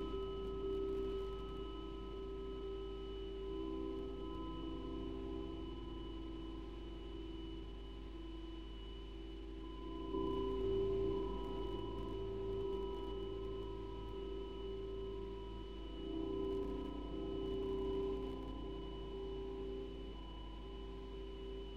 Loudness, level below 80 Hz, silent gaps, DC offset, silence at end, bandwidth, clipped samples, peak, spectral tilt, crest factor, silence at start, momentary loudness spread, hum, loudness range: -45 LUFS; -50 dBFS; none; under 0.1%; 0 s; 7.4 kHz; under 0.1%; -28 dBFS; -8 dB/octave; 14 dB; 0 s; 10 LU; none; 7 LU